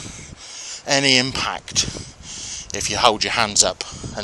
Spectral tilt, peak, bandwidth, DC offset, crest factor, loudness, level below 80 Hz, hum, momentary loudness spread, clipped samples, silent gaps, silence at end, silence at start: -1.5 dB/octave; 0 dBFS; over 20 kHz; under 0.1%; 22 dB; -18 LUFS; -44 dBFS; none; 18 LU; under 0.1%; none; 0 s; 0 s